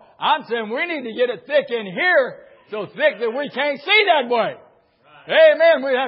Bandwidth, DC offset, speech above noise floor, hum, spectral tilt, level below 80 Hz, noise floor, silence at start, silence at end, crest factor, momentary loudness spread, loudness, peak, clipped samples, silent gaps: 5.6 kHz; under 0.1%; 35 dB; none; -8 dB/octave; -78 dBFS; -53 dBFS; 0.2 s; 0 s; 16 dB; 12 LU; -18 LUFS; -2 dBFS; under 0.1%; none